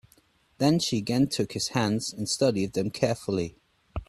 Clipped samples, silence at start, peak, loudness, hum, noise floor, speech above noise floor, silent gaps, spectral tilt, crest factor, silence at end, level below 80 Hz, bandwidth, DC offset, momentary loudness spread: under 0.1%; 0.6 s; -8 dBFS; -27 LUFS; none; -63 dBFS; 37 dB; none; -5 dB/octave; 20 dB; 0.05 s; -52 dBFS; 14 kHz; under 0.1%; 6 LU